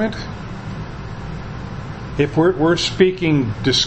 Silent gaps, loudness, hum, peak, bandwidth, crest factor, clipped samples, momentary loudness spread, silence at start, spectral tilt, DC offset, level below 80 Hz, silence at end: none; -19 LUFS; none; 0 dBFS; 8.6 kHz; 20 dB; under 0.1%; 15 LU; 0 s; -5 dB/octave; under 0.1%; -38 dBFS; 0 s